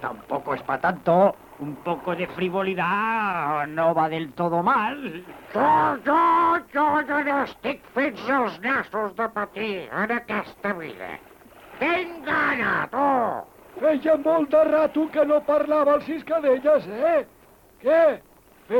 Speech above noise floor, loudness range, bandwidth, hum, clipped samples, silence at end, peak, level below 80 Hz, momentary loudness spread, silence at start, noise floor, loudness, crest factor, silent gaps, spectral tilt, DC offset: 31 dB; 5 LU; 18 kHz; none; under 0.1%; 0 s; -8 dBFS; -60 dBFS; 11 LU; 0 s; -53 dBFS; -23 LUFS; 16 dB; none; -7 dB/octave; under 0.1%